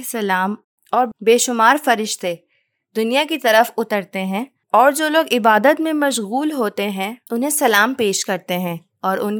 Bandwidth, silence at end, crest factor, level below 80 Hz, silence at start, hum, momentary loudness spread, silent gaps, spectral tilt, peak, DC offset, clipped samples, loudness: over 20 kHz; 0 s; 18 dB; -78 dBFS; 0 s; none; 10 LU; 0.64-0.78 s; -3 dB/octave; 0 dBFS; under 0.1%; under 0.1%; -17 LUFS